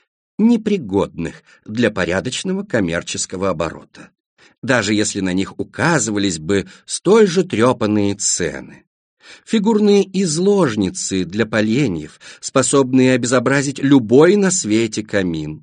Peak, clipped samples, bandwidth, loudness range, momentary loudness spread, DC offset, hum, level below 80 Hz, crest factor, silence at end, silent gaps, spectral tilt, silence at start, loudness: 0 dBFS; under 0.1%; 10 kHz; 6 LU; 11 LU; under 0.1%; none; -50 dBFS; 16 dB; 0 s; 4.20-4.37 s, 4.58-4.62 s, 8.87-9.17 s; -4.5 dB/octave; 0.4 s; -17 LUFS